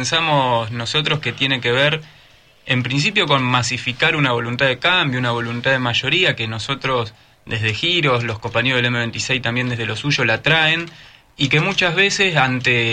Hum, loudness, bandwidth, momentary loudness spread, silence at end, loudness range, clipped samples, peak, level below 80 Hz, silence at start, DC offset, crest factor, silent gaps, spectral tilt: none; -17 LUFS; 10 kHz; 7 LU; 0 s; 2 LU; under 0.1%; -2 dBFS; -50 dBFS; 0 s; under 0.1%; 16 dB; none; -4 dB/octave